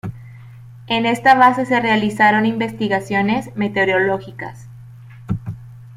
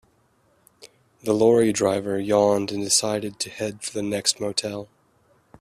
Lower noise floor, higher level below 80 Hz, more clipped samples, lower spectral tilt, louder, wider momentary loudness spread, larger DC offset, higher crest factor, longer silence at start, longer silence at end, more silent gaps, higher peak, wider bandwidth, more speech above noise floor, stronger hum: second, -39 dBFS vs -63 dBFS; first, -50 dBFS vs -60 dBFS; neither; first, -6 dB/octave vs -3.5 dB/octave; first, -17 LUFS vs -22 LUFS; first, 19 LU vs 11 LU; neither; about the same, 18 dB vs 20 dB; second, 0.05 s vs 0.8 s; second, 0 s vs 0.75 s; neither; about the same, -2 dBFS vs -4 dBFS; about the same, 15 kHz vs 15 kHz; second, 22 dB vs 41 dB; neither